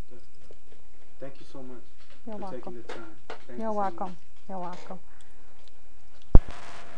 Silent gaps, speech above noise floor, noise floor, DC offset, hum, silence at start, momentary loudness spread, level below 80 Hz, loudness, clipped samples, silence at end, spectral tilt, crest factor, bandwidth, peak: none; 21 dB; -58 dBFS; 6%; none; 3.6 s; 22 LU; -30 dBFS; -33 LUFS; under 0.1%; 0.55 s; -7.5 dB/octave; 26 dB; 5.2 kHz; 0 dBFS